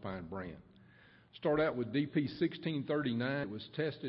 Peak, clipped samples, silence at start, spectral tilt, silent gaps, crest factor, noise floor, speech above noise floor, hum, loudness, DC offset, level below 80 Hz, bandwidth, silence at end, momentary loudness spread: -20 dBFS; under 0.1%; 0 s; -5.5 dB/octave; none; 16 dB; -62 dBFS; 27 dB; none; -36 LUFS; under 0.1%; -66 dBFS; 5.6 kHz; 0 s; 12 LU